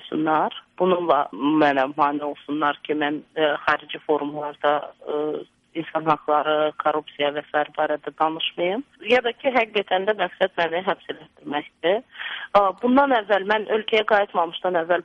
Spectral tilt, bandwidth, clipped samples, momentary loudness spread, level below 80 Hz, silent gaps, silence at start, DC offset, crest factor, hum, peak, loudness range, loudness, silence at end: -6 dB/octave; 7.4 kHz; under 0.1%; 10 LU; -64 dBFS; none; 0 s; under 0.1%; 18 dB; none; -4 dBFS; 3 LU; -22 LUFS; 0 s